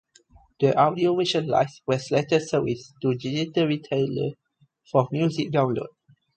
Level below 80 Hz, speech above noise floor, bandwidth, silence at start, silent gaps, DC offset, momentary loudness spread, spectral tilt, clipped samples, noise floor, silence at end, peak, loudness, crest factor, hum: -62 dBFS; 33 dB; 9 kHz; 0.6 s; none; under 0.1%; 7 LU; -6.5 dB/octave; under 0.1%; -56 dBFS; 0.5 s; -6 dBFS; -24 LUFS; 20 dB; none